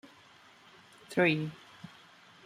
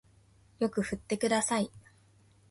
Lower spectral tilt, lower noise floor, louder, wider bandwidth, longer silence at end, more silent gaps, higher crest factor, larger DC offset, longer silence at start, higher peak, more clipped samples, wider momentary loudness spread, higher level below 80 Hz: first, -6 dB/octave vs -4 dB/octave; second, -59 dBFS vs -63 dBFS; about the same, -30 LUFS vs -31 LUFS; first, 15 kHz vs 11.5 kHz; about the same, 0.6 s vs 0.7 s; neither; about the same, 22 dB vs 18 dB; neither; first, 1.1 s vs 0.6 s; about the same, -14 dBFS vs -16 dBFS; neither; first, 24 LU vs 6 LU; second, -76 dBFS vs -62 dBFS